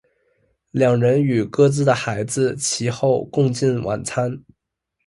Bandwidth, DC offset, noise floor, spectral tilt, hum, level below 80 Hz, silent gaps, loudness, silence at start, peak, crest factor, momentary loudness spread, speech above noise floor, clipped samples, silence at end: 11.5 kHz; under 0.1%; -77 dBFS; -5.5 dB/octave; none; -54 dBFS; none; -19 LUFS; 0.75 s; -4 dBFS; 16 dB; 8 LU; 58 dB; under 0.1%; 0.65 s